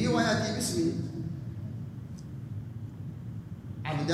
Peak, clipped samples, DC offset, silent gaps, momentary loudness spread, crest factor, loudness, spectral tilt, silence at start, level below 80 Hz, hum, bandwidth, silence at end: -14 dBFS; under 0.1%; under 0.1%; none; 14 LU; 18 dB; -34 LUFS; -5 dB/octave; 0 s; -58 dBFS; none; 15.5 kHz; 0 s